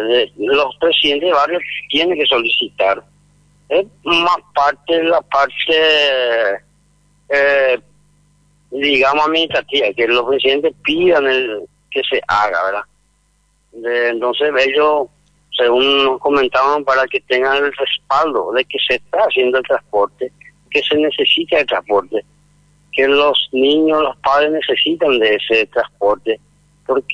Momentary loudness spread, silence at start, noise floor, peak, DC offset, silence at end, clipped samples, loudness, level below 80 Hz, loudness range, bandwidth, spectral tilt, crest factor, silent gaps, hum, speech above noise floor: 8 LU; 0 s; -59 dBFS; -2 dBFS; under 0.1%; 0 s; under 0.1%; -15 LUFS; -52 dBFS; 3 LU; 9.6 kHz; -4 dB/octave; 12 dB; none; 50 Hz at -55 dBFS; 44 dB